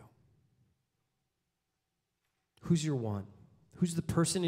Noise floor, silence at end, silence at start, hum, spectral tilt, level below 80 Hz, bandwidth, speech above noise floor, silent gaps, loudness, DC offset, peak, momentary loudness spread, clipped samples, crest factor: -85 dBFS; 0 s; 0 s; none; -5.5 dB/octave; -62 dBFS; 15.5 kHz; 53 dB; none; -34 LUFS; under 0.1%; -18 dBFS; 15 LU; under 0.1%; 18 dB